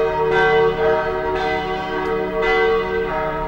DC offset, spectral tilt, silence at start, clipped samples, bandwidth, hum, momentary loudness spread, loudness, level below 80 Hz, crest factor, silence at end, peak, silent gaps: under 0.1%; -6 dB/octave; 0 s; under 0.1%; 16 kHz; none; 6 LU; -19 LUFS; -36 dBFS; 14 dB; 0 s; -6 dBFS; none